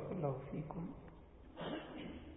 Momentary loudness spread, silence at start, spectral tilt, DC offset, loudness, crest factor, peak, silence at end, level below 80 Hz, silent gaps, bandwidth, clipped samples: 17 LU; 0 s; -6 dB/octave; under 0.1%; -46 LUFS; 20 dB; -26 dBFS; 0 s; -62 dBFS; none; 3.8 kHz; under 0.1%